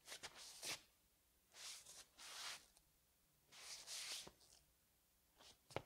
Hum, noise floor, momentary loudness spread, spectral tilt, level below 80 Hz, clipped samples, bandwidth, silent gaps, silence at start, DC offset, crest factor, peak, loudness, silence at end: none; -79 dBFS; 17 LU; -0.5 dB/octave; -84 dBFS; under 0.1%; 16 kHz; none; 0 s; under 0.1%; 32 dB; -28 dBFS; -53 LUFS; 0 s